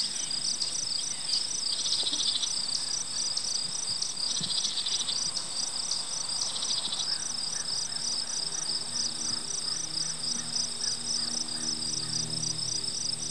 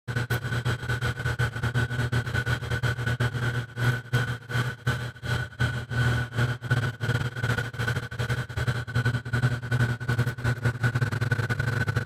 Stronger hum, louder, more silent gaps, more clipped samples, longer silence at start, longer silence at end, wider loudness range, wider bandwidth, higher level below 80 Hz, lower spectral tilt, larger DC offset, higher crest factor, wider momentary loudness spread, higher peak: neither; about the same, -28 LUFS vs -28 LUFS; neither; neither; about the same, 0 s vs 0.05 s; about the same, 0 s vs 0 s; about the same, 2 LU vs 1 LU; second, 11 kHz vs 14.5 kHz; second, -72 dBFS vs -44 dBFS; second, 0 dB/octave vs -6 dB/octave; first, 0.8% vs under 0.1%; about the same, 16 dB vs 16 dB; about the same, 3 LU vs 3 LU; second, -16 dBFS vs -12 dBFS